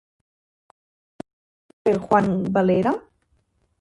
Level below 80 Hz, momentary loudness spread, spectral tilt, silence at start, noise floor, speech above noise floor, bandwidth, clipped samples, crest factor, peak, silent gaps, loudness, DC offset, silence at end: -58 dBFS; 24 LU; -8.5 dB/octave; 1.85 s; -66 dBFS; 47 dB; 11 kHz; under 0.1%; 22 dB; -4 dBFS; none; -21 LUFS; under 0.1%; 0.8 s